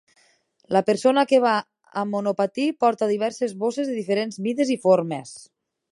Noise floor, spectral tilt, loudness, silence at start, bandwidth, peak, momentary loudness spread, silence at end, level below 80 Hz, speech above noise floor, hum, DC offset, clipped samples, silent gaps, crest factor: -62 dBFS; -5.5 dB/octave; -22 LUFS; 0.7 s; 11.5 kHz; -4 dBFS; 9 LU; 0.5 s; -76 dBFS; 40 dB; none; under 0.1%; under 0.1%; none; 18 dB